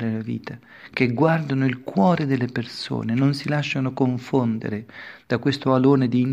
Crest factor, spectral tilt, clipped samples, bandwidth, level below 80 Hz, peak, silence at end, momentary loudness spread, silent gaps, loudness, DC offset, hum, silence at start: 18 dB; -7.5 dB/octave; under 0.1%; 10 kHz; -62 dBFS; -4 dBFS; 0 s; 13 LU; none; -22 LUFS; under 0.1%; none; 0 s